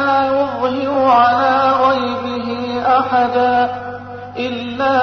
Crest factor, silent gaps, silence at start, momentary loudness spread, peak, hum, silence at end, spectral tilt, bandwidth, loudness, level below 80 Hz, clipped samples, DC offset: 12 dB; none; 0 s; 11 LU; -2 dBFS; 50 Hz at -40 dBFS; 0 s; -6 dB/octave; 6.4 kHz; -15 LUFS; -54 dBFS; under 0.1%; under 0.1%